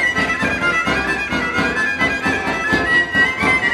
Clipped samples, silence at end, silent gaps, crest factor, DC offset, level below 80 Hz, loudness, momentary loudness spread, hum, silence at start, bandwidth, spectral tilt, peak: under 0.1%; 0 s; none; 14 dB; under 0.1%; -38 dBFS; -16 LUFS; 4 LU; none; 0 s; 14 kHz; -4 dB/octave; -2 dBFS